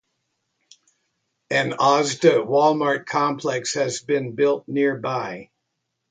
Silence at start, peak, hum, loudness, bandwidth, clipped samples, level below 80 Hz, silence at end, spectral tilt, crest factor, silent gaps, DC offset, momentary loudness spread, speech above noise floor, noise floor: 1.5 s; -4 dBFS; none; -21 LUFS; 9.4 kHz; under 0.1%; -70 dBFS; 0.7 s; -4.5 dB/octave; 20 dB; none; under 0.1%; 8 LU; 57 dB; -77 dBFS